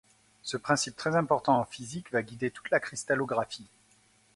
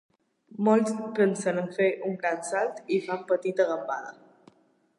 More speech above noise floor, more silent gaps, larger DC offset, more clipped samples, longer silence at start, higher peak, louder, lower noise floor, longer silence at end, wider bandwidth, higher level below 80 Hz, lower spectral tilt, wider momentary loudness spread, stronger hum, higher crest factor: about the same, 35 dB vs 36 dB; neither; neither; neither; about the same, 0.45 s vs 0.5 s; about the same, -10 dBFS vs -10 dBFS; second, -30 LUFS vs -27 LUFS; about the same, -64 dBFS vs -63 dBFS; second, 0.7 s vs 0.85 s; about the same, 11.5 kHz vs 11.5 kHz; first, -68 dBFS vs -82 dBFS; second, -4 dB/octave vs -5.5 dB/octave; first, 12 LU vs 8 LU; neither; about the same, 22 dB vs 18 dB